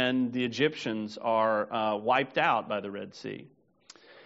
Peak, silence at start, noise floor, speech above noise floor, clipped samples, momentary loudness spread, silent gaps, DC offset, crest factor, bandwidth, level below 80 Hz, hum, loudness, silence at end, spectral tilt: -10 dBFS; 0 s; -57 dBFS; 28 dB; under 0.1%; 13 LU; none; under 0.1%; 20 dB; 7.6 kHz; -76 dBFS; none; -29 LUFS; 0.05 s; -3 dB/octave